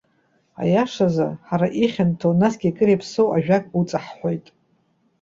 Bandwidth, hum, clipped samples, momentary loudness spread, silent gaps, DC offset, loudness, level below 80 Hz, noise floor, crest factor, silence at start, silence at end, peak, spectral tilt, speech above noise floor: 7.6 kHz; none; under 0.1%; 8 LU; none; under 0.1%; -21 LUFS; -58 dBFS; -64 dBFS; 16 dB; 0.6 s; 0.8 s; -4 dBFS; -7.5 dB/octave; 44 dB